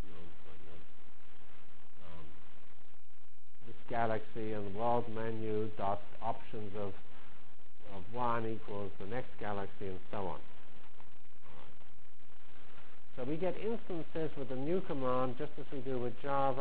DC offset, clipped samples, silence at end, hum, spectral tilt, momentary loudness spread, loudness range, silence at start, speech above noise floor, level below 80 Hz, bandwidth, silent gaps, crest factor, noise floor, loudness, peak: 4%; under 0.1%; 0 s; none; -9.5 dB/octave; 24 LU; 12 LU; 0 s; 28 dB; -64 dBFS; 4 kHz; none; 22 dB; -67 dBFS; -39 LUFS; -20 dBFS